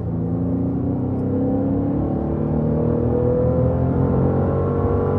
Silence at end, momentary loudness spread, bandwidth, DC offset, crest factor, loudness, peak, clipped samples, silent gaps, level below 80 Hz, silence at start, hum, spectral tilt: 0 s; 4 LU; 3.4 kHz; under 0.1%; 12 dB; -20 LUFS; -6 dBFS; under 0.1%; none; -34 dBFS; 0 s; none; -13 dB/octave